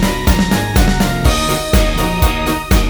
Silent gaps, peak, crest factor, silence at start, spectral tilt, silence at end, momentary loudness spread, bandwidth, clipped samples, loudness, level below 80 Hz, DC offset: none; 0 dBFS; 12 dB; 0 s; -5 dB/octave; 0 s; 2 LU; over 20 kHz; under 0.1%; -14 LUFS; -16 dBFS; under 0.1%